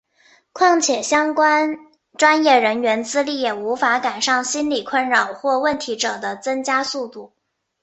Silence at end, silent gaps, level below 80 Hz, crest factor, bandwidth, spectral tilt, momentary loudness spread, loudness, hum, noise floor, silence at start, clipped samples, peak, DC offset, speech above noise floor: 0.55 s; none; -64 dBFS; 18 dB; 8.6 kHz; -1.5 dB/octave; 9 LU; -18 LUFS; none; -56 dBFS; 0.55 s; under 0.1%; -2 dBFS; under 0.1%; 37 dB